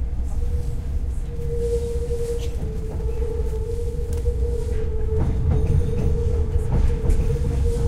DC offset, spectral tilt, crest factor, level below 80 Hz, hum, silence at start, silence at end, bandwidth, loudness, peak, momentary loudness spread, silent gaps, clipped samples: under 0.1%; -8 dB/octave; 14 dB; -22 dBFS; none; 0 s; 0 s; 12.5 kHz; -25 LUFS; -6 dBFS; 6 LU; none; under 0.1%